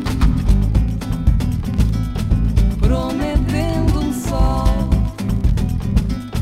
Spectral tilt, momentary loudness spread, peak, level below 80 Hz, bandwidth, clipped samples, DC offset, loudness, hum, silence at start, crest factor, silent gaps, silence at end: -7.5 dB/octave; 3 LU; -2 dBFS; -18 dBFS; 14 kHz; under 0.1%; under 0.1%; -19 LUFS; none; 0 s; 14 dB; none; 0 s